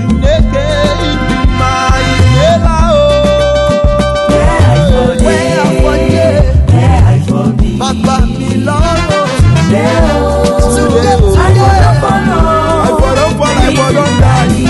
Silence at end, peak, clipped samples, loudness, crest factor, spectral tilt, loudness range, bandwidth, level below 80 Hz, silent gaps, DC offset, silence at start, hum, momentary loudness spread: 0 s; 0 dBFS; 0.1%; -9 LUFS; 8 dB; -6 dB/octave; 1 LU; 12 kHz; -14 dBFS; none; under 0.1%; 0 s; none; 4 LU